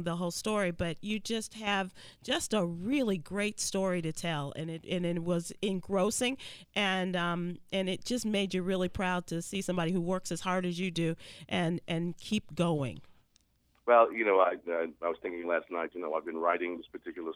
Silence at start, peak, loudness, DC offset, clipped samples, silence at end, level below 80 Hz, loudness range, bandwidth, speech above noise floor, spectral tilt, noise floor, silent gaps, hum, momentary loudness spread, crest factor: 0 s; -12 dBFS; -32 LUFS; under 0.1%; under 0.1%; 0 s; -60 dBFS; 3 LU; 15.5 kHz; 39 dB; -4.5 dB/octave; -71 dBFS; none; none; 8 LU; 22 dB